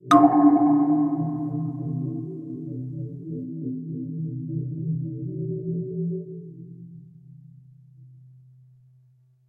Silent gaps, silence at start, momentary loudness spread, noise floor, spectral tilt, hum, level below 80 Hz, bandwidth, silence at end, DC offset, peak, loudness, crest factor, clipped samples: none; 0.05 s; 18 LU; -59 dBFS; -8.5 dB/octave; none; -66 dBFS; 9 kHz; 1.4 s; under 0.1%; -2 dBFS; -25 LUFS; 24 dB; under 0.1%